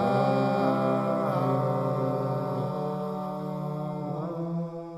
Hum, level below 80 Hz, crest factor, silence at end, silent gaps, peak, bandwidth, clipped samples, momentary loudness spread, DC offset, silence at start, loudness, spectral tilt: none; -70 dBFS; 14 dB; 0 s; none; -12 dBFS; 13.5 kHz; under 0.1%; 8 LU; under 0.1%; 0 s; -28 LUFS; -9 dB/octave